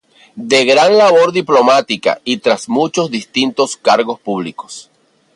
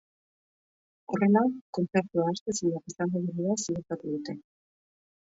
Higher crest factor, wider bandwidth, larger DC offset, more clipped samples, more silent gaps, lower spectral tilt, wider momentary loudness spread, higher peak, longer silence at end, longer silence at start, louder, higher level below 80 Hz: second, 14 dB vs 20 dB; first, 11.5 kHz vs 8 kHz; neither; neither; second, none vs 1.61-1.73 s, 2.41-2.46 s; second, -3.5 dB/octave vs -6 dB/octave; first, 14 LU vs 11 LU; first, 0 dBFS vs -10 dBFS; second, 0.55 s vs 0.9 s; second, 0.35 s vs 1.1 s; first, -13 LUFS vs -29 LUFS; first, -62 dBFS vs -70 dBFS